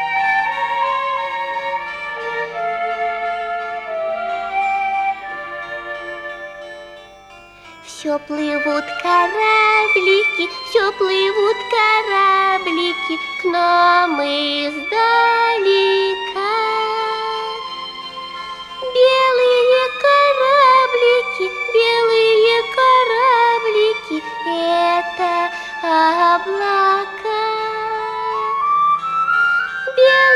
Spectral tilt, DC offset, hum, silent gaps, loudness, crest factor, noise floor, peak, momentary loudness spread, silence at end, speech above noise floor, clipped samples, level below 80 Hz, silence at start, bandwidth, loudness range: -2.5 dB/octave; under 0.1%; none; none; -16 LUFS; 16 dB; -42 dBFS; -2 dBFS; 13 LU; 0 s; 26 dB; under 0.1%; -58 dBFS; 0 s; 12 kHz; 9 LU